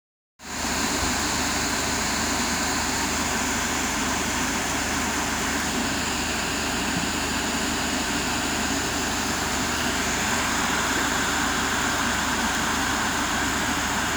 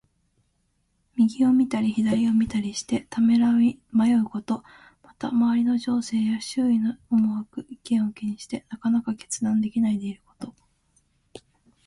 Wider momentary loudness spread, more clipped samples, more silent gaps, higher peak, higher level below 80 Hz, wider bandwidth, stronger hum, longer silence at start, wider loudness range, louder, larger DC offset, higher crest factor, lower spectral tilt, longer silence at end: second, 2 LU vs 14 LU; neither; neither; about the same, -10 dBFS vs -12 dBFS; first, -40 dBFS vs -60 dBFS; first, over 20 kHz vs 11.5 kHz; neither; second, 0.4 s vs 1.15 s; second, 1 LU vs 5 LU; about the same, -24 LUFS vs -24 LUFS; neither; about the same, 14 dB vs 14 dB; second, -2 dB/octave vs -5.5 dB/octave; second, 0 s vs 0.5 s